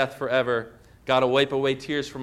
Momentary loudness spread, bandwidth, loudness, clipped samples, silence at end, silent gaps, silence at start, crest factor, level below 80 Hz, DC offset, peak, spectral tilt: 10 LU; 13.5 kHz; -24 LUFS; under 0.1%; 0 s; none; 0 s; 16 dB; -58 dBFS; under 0.1%; -8 dBFS; -5 dB/octave